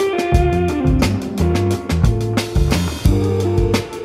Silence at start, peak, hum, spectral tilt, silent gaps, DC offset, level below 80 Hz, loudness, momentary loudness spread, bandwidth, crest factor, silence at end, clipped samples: 0 s; -2 dBFS; none; -6.5 dB/octave; none; under 0.1%; -24 dBFS; -17 LUFS; 3 LU; 15.5 kHz; 14 dB; 0 s; under 0.1%